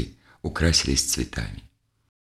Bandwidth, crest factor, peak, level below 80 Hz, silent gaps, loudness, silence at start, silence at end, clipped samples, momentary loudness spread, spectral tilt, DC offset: 14.5 kHz; 20 dB; -6 dBFS; -34 dBFS; none; -23 LUFS; 0 s; 0.55 s; under 0.1%; 16 LU; -3 dB/octave; under 0.1%